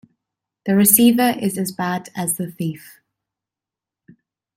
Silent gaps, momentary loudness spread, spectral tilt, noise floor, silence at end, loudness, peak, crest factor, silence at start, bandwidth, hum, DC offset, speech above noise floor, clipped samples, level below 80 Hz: none; 16 LU; -4 dB/octave; -88 dBFS; 1.8 s; -17 LUFS; 0 dBFS; 20 dB; 0.65 s; 16.5 kHz; none; under 0.1%; 70 dB; under 0.1%; -64 dBFS